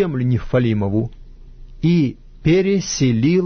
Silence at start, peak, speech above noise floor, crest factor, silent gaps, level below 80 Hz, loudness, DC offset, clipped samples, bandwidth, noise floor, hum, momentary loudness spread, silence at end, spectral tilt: 0 s; -6 dBFS; 21 dB; 12 dB; none; -38 dBFS; -18 LUFS; under 0.1%; under 0.1%; 6.6 kHz; -38 dBFS; none; 7 LU; 0 s; -6.5 dB/octave